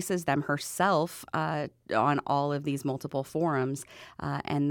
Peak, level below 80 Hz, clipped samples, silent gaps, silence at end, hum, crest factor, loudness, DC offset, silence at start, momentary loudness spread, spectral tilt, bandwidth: -12 dBFS; -64 dBFS; under 0.1%; none; 0 s; none; 18 dB; -30 LUFS; under 0.1%; 0 s; 8 LU; -5.5 dB/octave; 19 kHz